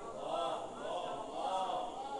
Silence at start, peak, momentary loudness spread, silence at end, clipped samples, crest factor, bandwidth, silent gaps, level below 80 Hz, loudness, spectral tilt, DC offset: 0 s; -24 dBFS; 5 LU; 0 s; under 0.1%; 14 dB; 11 kHz; none; -66 dBFS; -39 LUFS; -3.5 dB/octave; under 0.1%